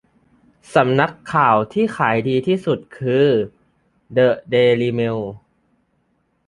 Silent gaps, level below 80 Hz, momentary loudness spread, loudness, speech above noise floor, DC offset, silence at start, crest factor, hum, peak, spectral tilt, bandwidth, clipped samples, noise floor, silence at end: none; -56 dBFS; 8 LU; -18 LUFS; 48 dB; under 0.1%; 0.7 s; 18 dB; none; -2 dBFS; -7 dB/octave; 11.5 kHz; under 0.1%; -65 dBFS; 1.1 s